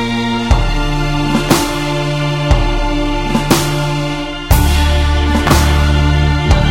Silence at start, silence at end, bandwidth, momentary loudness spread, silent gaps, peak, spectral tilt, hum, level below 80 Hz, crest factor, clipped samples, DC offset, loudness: 0 s; 0 s; 17 kHz; 5 LU; none; 0 dBFS; -5 dB/octave; none; -16 dBFS; 12 dB; under 0.1%; under 0.1%; -14 LUFS